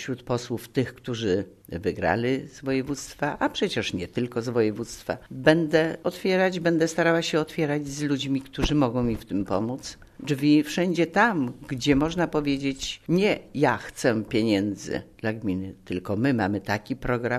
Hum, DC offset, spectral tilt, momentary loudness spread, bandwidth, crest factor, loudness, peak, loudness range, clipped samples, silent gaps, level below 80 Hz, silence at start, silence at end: none; under 0.1%; -5.5 dB/octave; 10 LU; 13.5 kHz; 22 dB; -26 LUFS; -4 dBFS; 4 LU; under 0.1%; none; -48 dBFS; 0 s; 0 s